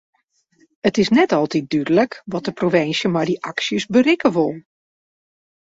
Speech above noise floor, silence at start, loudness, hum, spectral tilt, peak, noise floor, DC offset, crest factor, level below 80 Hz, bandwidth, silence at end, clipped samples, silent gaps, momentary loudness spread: 44 dB; 0.85 s; -19 LUFS; none; -5.5 dB/octave; -2 dBFS; -61 dBFS; under 0.1%; 16 dB; -58 dBFS; 7.8 kHz; 1.15 s; under 0.1%; none; 7 LU